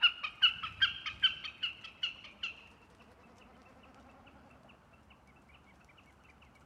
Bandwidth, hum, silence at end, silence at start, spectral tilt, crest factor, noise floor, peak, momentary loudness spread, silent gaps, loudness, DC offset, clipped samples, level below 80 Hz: 12.5 kHz; none; 2.65 s; 0 s; -1 dB/octave; 24 dB; -61 dBFS; -14 dBFS; 13 LU; none; -33 LUFS; under 0.1%; under 0.1%; -68 dBFS